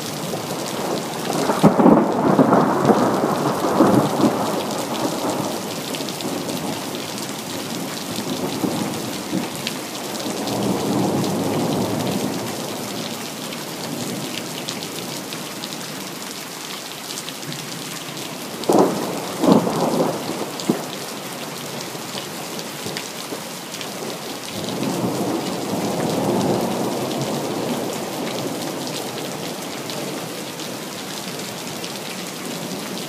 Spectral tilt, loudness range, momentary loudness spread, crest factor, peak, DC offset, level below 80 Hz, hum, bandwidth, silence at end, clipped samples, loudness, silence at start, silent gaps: -4.5 dB/octave; 10 LU; 12 LU; 22 dB; 0 dBFS; under 0.1%; -60 dBFS; none; 16 kHz; 0 s; under 0.1%; -23 LUFS; 0 s; none